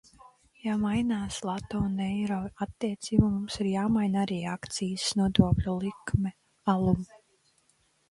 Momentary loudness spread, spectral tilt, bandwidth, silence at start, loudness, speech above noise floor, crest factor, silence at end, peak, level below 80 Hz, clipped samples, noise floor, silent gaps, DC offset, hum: 9 LU; -6 dB/octave; 11.5 kHz; 0.25 s; -29 LUFS; 41 dB; 24 dB; 1.05 s; -6 dBFS; -46 dBFS; under 0.1%; -69 dBFS; none; under 0.1%; none